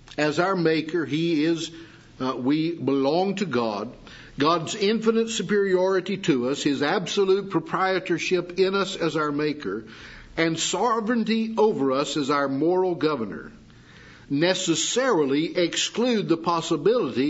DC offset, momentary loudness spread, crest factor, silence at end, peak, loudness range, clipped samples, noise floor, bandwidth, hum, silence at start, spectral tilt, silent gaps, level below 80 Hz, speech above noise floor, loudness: under 0.1%; 8 LU; 18 dB; 0 s; -6 dBFS; 2 LU; under 0.1%; -48 dBFS; 8 kHz; none; 0.1 s; -4.5 dB/octave; none; -60 dBFS; 25 dB; -24 LUFS